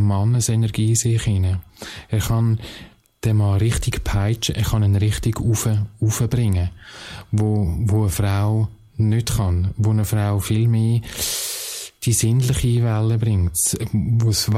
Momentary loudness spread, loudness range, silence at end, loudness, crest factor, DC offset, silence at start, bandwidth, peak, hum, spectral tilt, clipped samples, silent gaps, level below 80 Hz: 7 LU; 2 LU; 0 s; -20 LUFS; 12 dB; under 0.1%; 0 s; 16 kHz; -6 dBFS; none; -5.5 dB/octave; under 0.1%; none; -34 dBFS